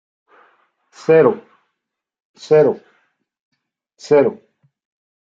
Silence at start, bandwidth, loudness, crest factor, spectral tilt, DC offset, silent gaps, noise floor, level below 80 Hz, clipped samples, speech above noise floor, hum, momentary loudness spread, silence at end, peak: 1.1 s; 7.6 kHz; -15 LUFS; 18 dB; -7 dB/octave; under 0.1%; 2.25-2.34 s, 3.40-3.52 s; -79 dBFS; -68 dBFS; under 0.1%; 66 dB; none; 15 LU; 1 s; -2 dBFS